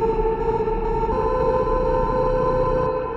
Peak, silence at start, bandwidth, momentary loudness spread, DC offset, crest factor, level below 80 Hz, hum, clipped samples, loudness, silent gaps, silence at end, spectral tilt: -8 dBFS; 0 s; 7 kHz; 2 LU; under 0.1%; 12 dB; -28 dBFS; none; under 0.1%; -21 LUFS; none; 0 s; -9 dB/octave